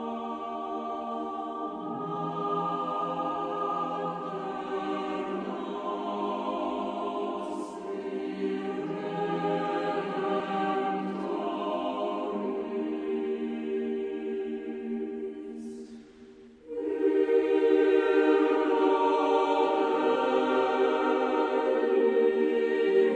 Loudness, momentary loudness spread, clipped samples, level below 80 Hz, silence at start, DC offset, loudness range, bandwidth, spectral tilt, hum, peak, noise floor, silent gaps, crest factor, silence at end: -29 LUFS; 11 LU; under 0.1%; -70 dBFS; 0 s; under 0.1%; 8 LU; 9.2 kHz; -6.5 dB/octave; none; -12 dBFS; -51 dBFS; none; 16 dB; 0 s